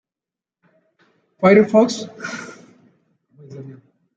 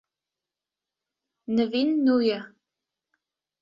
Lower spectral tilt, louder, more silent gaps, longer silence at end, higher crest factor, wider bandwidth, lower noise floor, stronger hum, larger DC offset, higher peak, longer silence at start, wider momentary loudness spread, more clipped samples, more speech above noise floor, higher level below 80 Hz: about the same, -6 dB/octave vs -7 dB/octave; first, -16 LUFS vs -24 LUFS; neither; second, 0.45 s vs 1.15 s; about the same, 20 dB vs 16 dB; first, 8.8 kHz vs 7.2 kHz; about the same, -89 dBFS vs -89 dBFS; neither; neither; first, -2 dBFS vs -12 dBFS; about the same, 1.4 s vs 1.5 s; first, 26 LU vs 11 LU; neither; first, 74 dB vs 66 dB; first, -64 dBFS vs -72 dBFS